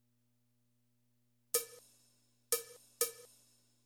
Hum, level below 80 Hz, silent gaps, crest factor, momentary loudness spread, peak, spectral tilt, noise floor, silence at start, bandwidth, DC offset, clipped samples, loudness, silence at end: 60 Hz at -80 dBFS; -86 dBFS; none; 28 dB; 19 LU; -18 dBFS; 1 dB/octave; -79 dBFS; 1.55 s; over 20 kHz; under 0.1%; under 0.1%; -37 LUFS; 0.6 s